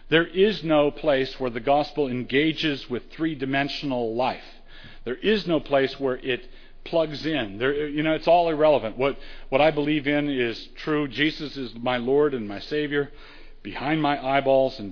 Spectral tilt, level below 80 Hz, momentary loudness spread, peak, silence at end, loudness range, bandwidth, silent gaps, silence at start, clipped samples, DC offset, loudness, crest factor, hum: -7 dB/octave; -44 dBFS; 11 LU; -4 dBFS; 0 s; 4 LU; 5.4 kHz; none; 0 s; under 0.1%; under 0.1%; -24 LUFS; 20 dB; none